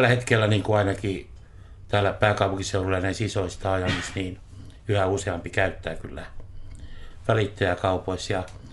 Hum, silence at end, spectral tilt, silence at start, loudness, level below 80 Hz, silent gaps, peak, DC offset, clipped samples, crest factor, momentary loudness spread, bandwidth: none; 0 s; -5.5 dB/octave; 0 s; -25 LUFS; -44 dBFS; none; -6 dBFS; under 0.1%; under 0.1%; 20 dB; 21 LU; 11.5 kHz